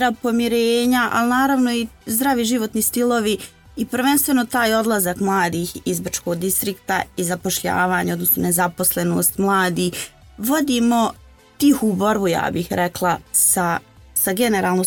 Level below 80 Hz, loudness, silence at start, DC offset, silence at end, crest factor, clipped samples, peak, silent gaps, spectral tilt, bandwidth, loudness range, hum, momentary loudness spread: -50 dBFS; -19 LUFS; 0 s; under 0.1%; 0 s; 14 dB; under 0.1%; -6 dBFS; none; -3.5 dB/octave; 19 kHz; 2 LU; none; 7 LU